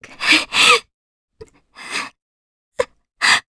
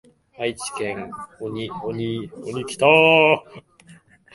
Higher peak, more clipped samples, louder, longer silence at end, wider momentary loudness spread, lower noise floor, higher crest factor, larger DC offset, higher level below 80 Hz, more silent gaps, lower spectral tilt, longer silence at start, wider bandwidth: about the same, 0 dBFS vs 0 dBFS; neither; first, -15 LUFS vs -20 LUFS; second, 0.1 s vs 0.4 s; about the same, 16 LU vs 18 LU; second, -45 dBFS vs -50 dBFS; about the same, 20 dB vs 22 dB; neither; about the same, -56 dBFS vs -60 dBFS; first, 0.94-1.28 s, 2.22-2.72 s vs none; second, 0 dB/octave vs -4.5 dB/octave; second, 0.2 s vs 0.4 s; about the same, 11 kHz vs 11.5 kHz